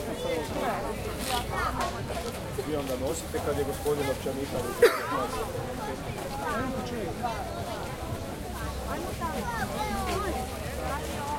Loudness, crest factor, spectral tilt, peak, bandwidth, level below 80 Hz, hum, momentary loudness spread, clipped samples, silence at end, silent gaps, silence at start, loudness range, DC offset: -31 LUFS; 24 dB; -4.5 dB/octave; -8 dBFS; 16.5 kHz; -42 dBFS; none; 6 LU; under 0.1%; 0 s; none; 0 s; 5 LU; under 0.1%